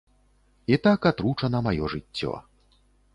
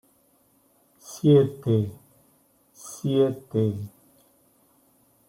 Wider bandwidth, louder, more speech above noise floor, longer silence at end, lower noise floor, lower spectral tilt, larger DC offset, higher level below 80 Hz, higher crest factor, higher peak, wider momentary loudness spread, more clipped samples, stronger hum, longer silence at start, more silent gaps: second, 11 kHz vs 16.5 kHz; about the same, -25 LUFS vs -24 LUFS; about the same, 38 dB vs 41 dB; second, 0.75 s vs 1.4 s; about the same, -62 dBFS vs -63 dBFS; about the same, -8 dB/octave vs -8 dB/octave; neither; first, -48 dBFS vs -66 dBFS; about the same, 20 dB vs 20 dB; about the same, -6 dBFS vs -8 dBFS; second, 12 LU vs 22 LU; neither; first, 50 Hz at -50 dBFS vs none; second, 0.7 s vs 1.05 s; neither